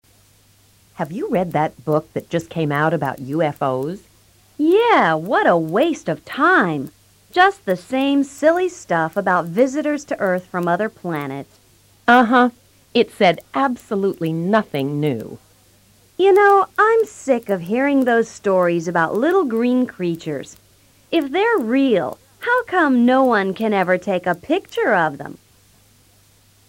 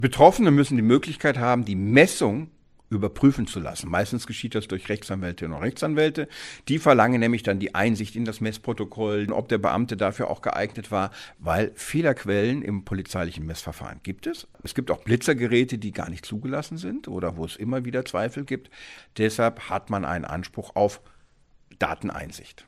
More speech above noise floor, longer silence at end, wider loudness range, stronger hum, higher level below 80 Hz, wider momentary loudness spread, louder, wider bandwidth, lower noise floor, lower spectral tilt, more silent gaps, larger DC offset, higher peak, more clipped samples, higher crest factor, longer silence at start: about the same, 36 dB vs 34 dB; first, 1.3 s vs 0.05 s; about the same, 4 LU vs 6 LU; neither; second, -60 dBFS vs -50 dBFS; second, 11 LU vs 14 LU; first, -18 LUFS vs -25 LUFS; about the same, 16.5 kHz vs 15 kHz; second, -54 dBFS vs -58 dBFS; about the same, -6 dB/octave vs -6 dB/octave; neither; neither; about the same, -2 dBFS vs 0 dBFS; neither; second, 16 dB vs 24 dB; first, 1 s vs 0 s